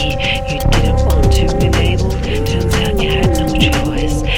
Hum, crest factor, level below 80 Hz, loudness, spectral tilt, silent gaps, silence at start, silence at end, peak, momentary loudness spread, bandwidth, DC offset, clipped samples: none; 12 dB; -18 dBFS; -15 LUFS; -5.5 dB/octave; none; 0 s; 0 s; 0 dBFS; 4 LU; 17 kHz; 0.4%; under 0.1%